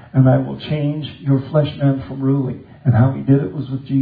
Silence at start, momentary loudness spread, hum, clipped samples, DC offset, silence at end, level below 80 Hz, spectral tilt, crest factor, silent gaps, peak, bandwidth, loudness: 0.15 s; 9 LU; none; under 0.1%; under 0.1%; 0 s; -46 dBFS; -12 dB/octave; 16 dB; none; -2 dBFS; 4.8 kHz; -18 LUFS